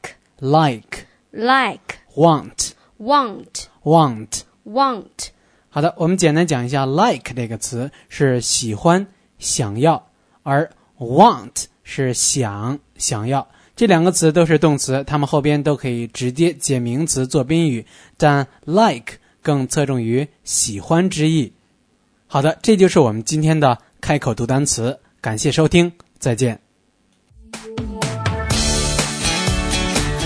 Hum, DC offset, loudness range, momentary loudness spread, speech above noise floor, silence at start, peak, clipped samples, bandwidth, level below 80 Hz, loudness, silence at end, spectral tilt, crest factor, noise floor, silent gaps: none; under 0.1%; 3 LU; 14 LU; 44 dB; 0.05 s; 0 dBFS; under 0.1%; 11 kHz; -36 dBFS; -18 LUFS; 0 s; -4.5 dB/octave; 18 dB; -61 dBFS; none